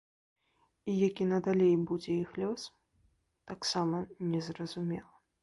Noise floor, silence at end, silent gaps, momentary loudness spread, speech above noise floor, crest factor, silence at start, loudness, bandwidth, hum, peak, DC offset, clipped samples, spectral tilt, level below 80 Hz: -72 dBFS; 0.4 s; none; 14 LU; 40 dB; 16 dB; 0.85 s; -33 LUFS; 11.5 kHz; none; -18 dBFS; under 0.1%; under 0.1%; -6 dB/octave; -68 dBFS